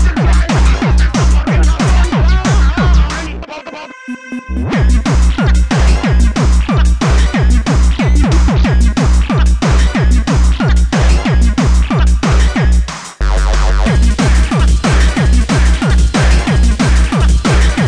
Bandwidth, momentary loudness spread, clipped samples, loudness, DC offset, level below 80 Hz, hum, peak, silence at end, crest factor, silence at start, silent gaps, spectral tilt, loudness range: 10.5 kHz; 5 LU; under 0.1%; -12 LUFS; 1%; -10 dBFS; none; 0 dBFS; 0 s; 10 dB; 0 s; none; -6 dB/octave; 3 LU